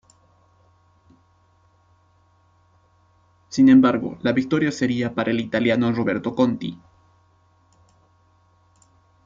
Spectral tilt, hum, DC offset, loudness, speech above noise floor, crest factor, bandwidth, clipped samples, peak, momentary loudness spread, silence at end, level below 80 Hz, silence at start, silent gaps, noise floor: -6.5 dB/octave; none; under 0.1%; -20 LUFS; 40 dB; 18 dB; 7.6 kHz; under 0.1%; -6 dBFS; 10 LU; 2.5 s; -60 dBFS; 3.5 s; none; -59 dBFS